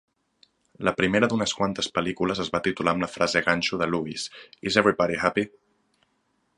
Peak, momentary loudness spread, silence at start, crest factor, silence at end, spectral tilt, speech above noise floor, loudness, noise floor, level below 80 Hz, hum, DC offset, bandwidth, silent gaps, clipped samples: -2 dBFS; 8 LU; 0.8 s; 24 dB; 1.1 s; -4.5 dB/octave; 46 dB; -25 LUFS; -71 dBFS; -56 dBFS; none; under 0.1%; 11.5 kHz; none; under 0.1%